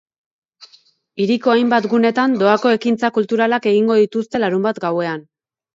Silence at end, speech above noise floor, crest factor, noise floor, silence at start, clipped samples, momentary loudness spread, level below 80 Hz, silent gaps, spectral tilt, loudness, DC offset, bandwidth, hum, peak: 0.55 s; 38 dB; 16 dB; -53 dBFS; 0.6 s; under 0.1%; 7 LU; -66 dBFS; none; -6.5 dB/octave; -16 LUFS; under 0.1%; 7.6 kHz; none; -2 dBFS